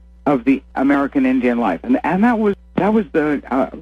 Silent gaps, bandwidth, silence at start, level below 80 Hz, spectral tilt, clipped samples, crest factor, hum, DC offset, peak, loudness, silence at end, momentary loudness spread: none; 6.2 kHz; 0.25 s; -44 dBFS; -8.5 dB/octave; under 0.1%; 12 dB; none; under 0.1%; -4 dBFS; -17 LUFS; 0 s; 4 LU